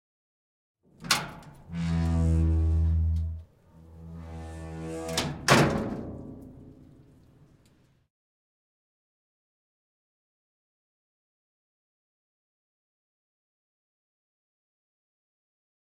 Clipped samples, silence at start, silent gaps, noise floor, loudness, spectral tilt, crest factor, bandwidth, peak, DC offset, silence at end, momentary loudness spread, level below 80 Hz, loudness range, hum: under 0.1%; 1 s; none; -63 dBFS; -27 LUFS; -5 dB/octave; 28 dB; 16.5 kHz; -4 dBFS; under 0.1%; 9.1 s; 23 LU; -42 dBFS; 2 LU; none